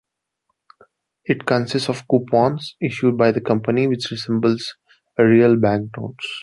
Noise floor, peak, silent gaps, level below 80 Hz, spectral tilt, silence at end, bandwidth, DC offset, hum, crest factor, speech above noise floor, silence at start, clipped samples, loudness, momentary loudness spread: -74 dBFS; -2 dBFS; none; -58 dBFS; -6.5 dB/octave; 0 s; 11.5 kHz; under 0.1%; none; 16 dB; 56 dB; 1.3 s; under 0.1%; -19 LUFS; 14 LU